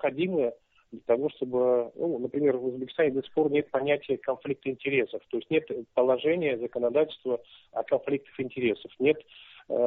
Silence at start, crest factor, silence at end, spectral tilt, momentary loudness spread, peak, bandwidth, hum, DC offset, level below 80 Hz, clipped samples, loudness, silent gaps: 0 s; 16 dB; 0 s; -4.5 dB/octave; 7 LU; -12 dBFS; 4.1 kHz; none; under 0.1%; -70 dBFS; under 0.1%; -28 LUFS; none